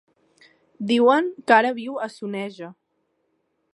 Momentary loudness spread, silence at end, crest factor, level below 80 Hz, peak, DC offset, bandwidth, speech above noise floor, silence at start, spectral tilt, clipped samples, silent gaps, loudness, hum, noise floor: 16 LU; 1 s; 22 dB; -78 dBFS; -2 dBFS; under 0.1%; 11.5 kHz; 51 dB; 0.8 s; -5 dB/octave; under 0.1%; none; -21 LUFS; none; -72 dBFS